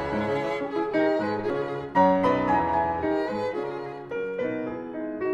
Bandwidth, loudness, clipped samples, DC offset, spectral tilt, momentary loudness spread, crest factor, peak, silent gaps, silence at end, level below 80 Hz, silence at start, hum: 9.8 kHz; -26 LUFS; under 0.1%; under 0.1%; -7.5 dB/octave; 11 LU; 16 dB; -10 dBFS; none; 0 s; -54 dBFS; 0 s; none